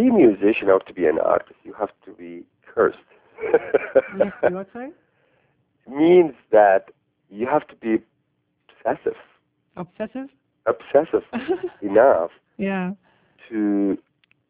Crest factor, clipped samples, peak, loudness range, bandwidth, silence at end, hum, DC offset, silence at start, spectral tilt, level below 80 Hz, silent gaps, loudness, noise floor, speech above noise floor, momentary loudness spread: 20 dB; under 0.1%; -2 dBFS; 7 LU; 4 kHz; 0.55 s; none; under 0.1%; 0 s; -10.5 dB/octave; -60 dBFS; none; -21 LUFS; -71 dBFS; 51 dB; 21 LU